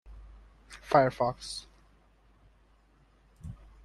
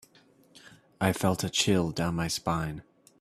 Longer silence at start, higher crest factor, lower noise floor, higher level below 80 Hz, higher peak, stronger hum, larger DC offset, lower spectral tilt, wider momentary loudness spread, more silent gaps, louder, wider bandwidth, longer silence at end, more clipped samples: second, 0.05 s vs 1 s; about the same, 26 dB vs 22 dB; about the same, -63 dBFS vs -61 dBFS; about the same, -56 dBFS vs -54 dBFS; about the same, -8 dBFS vs -10 dBFS; neither; neither; about the same, -5.5 dB/octave vs -4.5 dB/octave; first, 27 LU vs 7 LU; neither; about the same, -29 LUFS vs -28 LUFS; second, 12.5 kHz vs 15 kHz; about the same, 0.3 s vs 0.4 s; neither